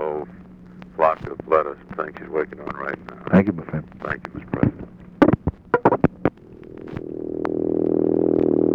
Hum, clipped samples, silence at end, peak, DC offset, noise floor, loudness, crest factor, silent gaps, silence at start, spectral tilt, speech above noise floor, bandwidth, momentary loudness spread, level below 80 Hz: none; under 0.1%; 0 s; -2 dBFS; under 0.1%; -42 dBFS; -22 LUFS; 20 dB; none; 0 s; -10 dB/octave; 18 dB; 6 kHz; 15 LU; -46 dBFS